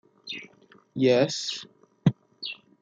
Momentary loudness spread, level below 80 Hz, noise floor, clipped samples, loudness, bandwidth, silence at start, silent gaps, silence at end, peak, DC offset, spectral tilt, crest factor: 16 LU; -68 dBFS; -57 dBFS; under 0.1%; -27 LUFS; 9.4 kHz; 0.25 s; none; 0.3 s; -8 dBFS; under 0.1%; -5.5 dB/octave; 20 dB